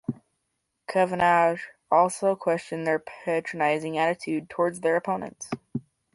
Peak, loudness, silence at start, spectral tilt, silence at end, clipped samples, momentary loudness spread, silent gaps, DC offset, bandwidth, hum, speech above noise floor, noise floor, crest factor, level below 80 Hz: -8 dBFS; -26 LUFS; 0.1 s; -5 dB/octave; 0.35 s; under 0.1%; 15 LU; none; under 0.1%; 11.5 kHz; none; 53 dB; -78 dBFS; 18 dB; -66 dBFS